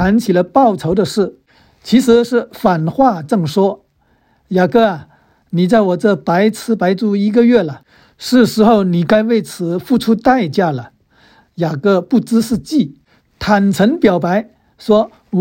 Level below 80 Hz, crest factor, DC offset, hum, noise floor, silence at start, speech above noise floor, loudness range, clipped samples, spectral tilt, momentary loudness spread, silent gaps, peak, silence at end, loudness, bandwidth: -44 dBFS; 14 dB; under 0.1%; none; -57 dBFS; 0 s; 44 dB; 3 LU; under 0.1%; -6.5 dB/octave; 10 LU; none; 0 dBFS; 0 s; -14 LUFS; 16.5 kHz